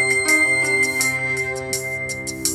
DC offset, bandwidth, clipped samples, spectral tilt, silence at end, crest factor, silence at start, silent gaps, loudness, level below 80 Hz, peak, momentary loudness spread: under 0.1%; 19 kHz; under 0.1%; -2 dB/octave; 0 s; 16 dB; 0 s; none; -18 LUFS; -52 dBFS; -4 dBFS; 10 LU